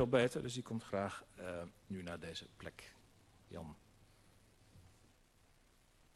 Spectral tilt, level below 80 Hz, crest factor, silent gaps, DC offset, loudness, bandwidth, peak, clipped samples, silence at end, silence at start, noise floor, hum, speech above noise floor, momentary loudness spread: -5.5 dB/octave; -68 dBFS; 26 dB; none; under 0.1%; -43 LUFS; 13 kHz; -18 dBFS; under 0.1%; 1.35 s; 0 s; -70 dBFS; none; 28 dB; 18 LU